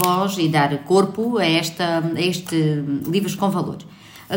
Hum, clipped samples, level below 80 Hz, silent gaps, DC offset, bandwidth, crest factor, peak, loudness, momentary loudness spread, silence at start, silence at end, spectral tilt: none; under 0.1%; -62 dBFS; none; under 0.1%; 16.5 kHz; 20 dB; 0 dBFS; -20 LUFS; 5 LU; 0 s; 0 s; -5.5 dB/octave